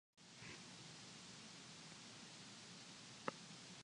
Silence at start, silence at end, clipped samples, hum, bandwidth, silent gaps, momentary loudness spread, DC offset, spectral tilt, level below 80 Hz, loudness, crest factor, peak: 0.15 s; 0 s; under 0.1%; none; 11 kHz; none; 5 LU; under 0.1%; -2.5 dB/octave; -86 dBFS; -55 LUFS; 34 dB; -24 dBFS